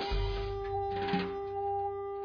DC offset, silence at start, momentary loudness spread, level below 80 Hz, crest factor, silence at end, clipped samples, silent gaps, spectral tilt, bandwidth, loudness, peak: under 0.1%; 0 s; 4 LU; -42 dBFS; 14 dB; 0 s; under 0.1%; none; -7.5 dB/octave; 5.4 kHz; -35 LUFS; -20 dBFS